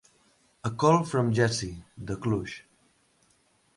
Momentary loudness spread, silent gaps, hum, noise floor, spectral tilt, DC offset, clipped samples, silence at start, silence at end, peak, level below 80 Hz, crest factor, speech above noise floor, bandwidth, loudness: 17 LU; none; none; -67 dBFS; -6 dB/octave; under 0.1%; under 0.1%; 0.65 s; 1.15 s; -8 dBFS; -56 dBFS; 22 dB; 40 dB; 11.5 kHz; -27 LUFS